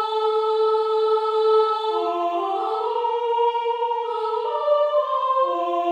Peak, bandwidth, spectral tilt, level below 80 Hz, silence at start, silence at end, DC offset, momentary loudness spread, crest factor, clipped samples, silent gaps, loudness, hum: -10 dBFS; 7.8 kHz; -2.5 dB/octave; -88 dBFS; 0 s; 0 s; under 0.1%; 5 LU; 12 dB; under 0.1%; none; -22 LUFS; none